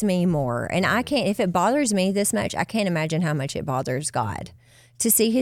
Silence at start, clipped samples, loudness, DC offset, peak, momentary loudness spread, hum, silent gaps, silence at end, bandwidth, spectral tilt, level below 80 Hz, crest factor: 0 s; under 0.1%; -23 LUFS; under 0.1%; -6 dBFS; 7 LU; none; none; 0 s; 16.5 kHz; -4.5 dB/octave; -54 dBFS; 16 dB